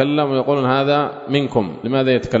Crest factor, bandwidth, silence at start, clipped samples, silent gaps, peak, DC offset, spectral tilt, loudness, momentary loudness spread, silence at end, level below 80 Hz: 16 dB; 7.8 kHz; 0 s; under 0.1%; none; -2 dBFS; under 0.1%; -7.5 dB/octave; -18 LUFS; 4 LU; 0 s; -50 dBFS